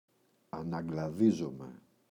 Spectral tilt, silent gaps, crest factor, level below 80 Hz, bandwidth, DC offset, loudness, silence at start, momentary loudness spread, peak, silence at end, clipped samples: -8 dB/octave; none; 18 dB; -66 dBFS; 10.5 kHz; under 0.1%; -33 LUFS; 0.55 s; 18 LU; -16 dBFS; 0.3 s; under 0.1%